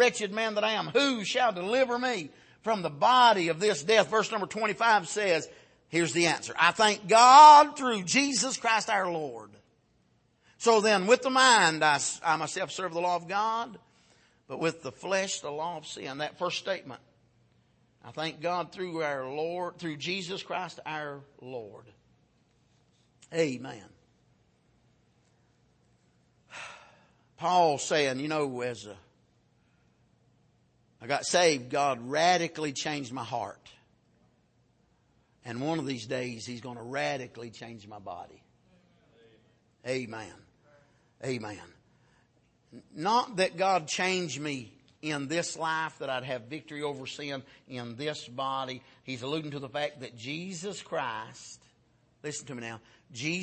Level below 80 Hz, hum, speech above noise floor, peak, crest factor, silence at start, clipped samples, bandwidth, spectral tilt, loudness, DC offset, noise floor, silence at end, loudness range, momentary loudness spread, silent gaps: -74 dBFS; none; 41 dB; -4 dBFS; 26 dB; 0 s; under 0.1%; 8.8 kHz; -3 dB/octave; -27 LUFS; under 0.1%; -68 dBFS; 0 s; 19 LU; 20 LU; none